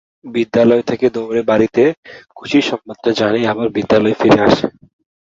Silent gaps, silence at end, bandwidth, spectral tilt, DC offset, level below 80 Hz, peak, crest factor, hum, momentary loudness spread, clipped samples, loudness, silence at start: 1.97-2.03 s; 0.5 s; 7.8 kHz; -6 dB/octave; under 0.1%; -48 dBFS; 0 dBFS; 14 dB; none; 9 LU; under 0.1%; -15 LUFS; 0.25 s